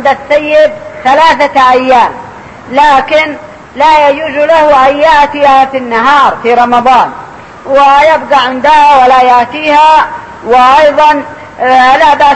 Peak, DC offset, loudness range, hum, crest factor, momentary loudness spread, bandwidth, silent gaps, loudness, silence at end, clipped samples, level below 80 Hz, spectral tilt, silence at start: 0 dBFS; 0.3%; 2 LU; none; 6 dB; 10 LU; 11 kHz; none; -6 LUFS; 0 s; 4%; -38 dBFS; -3.5 dB/octave; 0 s